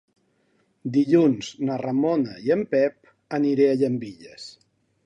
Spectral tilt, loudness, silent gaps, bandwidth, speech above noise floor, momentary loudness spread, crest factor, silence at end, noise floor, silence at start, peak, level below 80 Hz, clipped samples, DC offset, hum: -7 dB/octave; -23 LUFS; none; 9 kHz; 44 dB; 20 LU; 18 dB; 0.55 s; -67 dBFS; 0.85 s; -6 dBFS; -68 dBFS; under 0.1%; under 0.1%; none